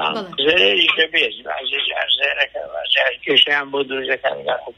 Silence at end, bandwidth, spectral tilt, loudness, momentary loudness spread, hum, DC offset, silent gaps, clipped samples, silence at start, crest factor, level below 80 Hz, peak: 0.05 s; 11.5 kHz; -3 dB/octave; -17 LUFS; 9 LU; none; under 0.1%; none; under 0.1%; 0 s; 18 dB; -58 dBFS; 0 dBFS